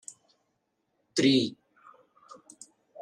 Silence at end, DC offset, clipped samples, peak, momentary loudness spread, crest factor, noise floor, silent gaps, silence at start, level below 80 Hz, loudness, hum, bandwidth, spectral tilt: 1.5 s; under 0.1%; under 0.1%; -12 dBFS; 27 LU; 20 dB; -78 dBFS; none; 1.15 s; -78 dBFS; -26 LUFS; none; 11 kHz; -4.5 dB/octave